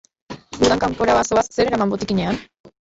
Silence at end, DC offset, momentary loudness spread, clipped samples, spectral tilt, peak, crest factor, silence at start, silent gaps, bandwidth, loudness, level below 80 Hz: 0.2 s; under 0.1%; 16 LU; under 0.1%; -4.5 dB/octave; -4 dBFS; 16 dB; 0.3 s; 2.60-2.64 s; 8.2 kHz; -19 LUFS; -44 dBFS